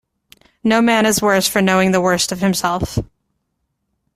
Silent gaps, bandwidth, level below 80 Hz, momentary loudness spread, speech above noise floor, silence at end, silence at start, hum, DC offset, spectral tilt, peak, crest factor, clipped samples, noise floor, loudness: none; 15.5 kHz; -42 dBFS; 8 LU; 56 dB; 1.1 s; 0.65 s; none; under 0.1%; -4 dB/octave; -2 dBFS; 14 dB; under 0.1%; -72 dBFS; -16 LUFS